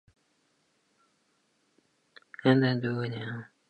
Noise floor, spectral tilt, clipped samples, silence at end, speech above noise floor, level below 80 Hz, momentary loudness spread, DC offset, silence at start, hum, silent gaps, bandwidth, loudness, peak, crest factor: -72 dBFS; -8.5 dB/octave; under 0.1%; 0.25 s; 45 dB; -74 dBFS; 15 LU; under 0.1%; 2.45 s; none; none; 8.4 kHz; -28 LUFS; -10 dBFS; 24 dB